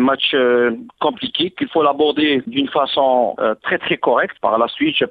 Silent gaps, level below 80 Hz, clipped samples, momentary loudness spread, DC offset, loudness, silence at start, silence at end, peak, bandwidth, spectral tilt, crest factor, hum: none; -60 dBFS; under 0.1%; 5 LU; under 0.1%; -17 LUFS; 0 s; 0 s; -2 dBFS; 4.9 kHz; -7.5 dB/octave; 14 dB; none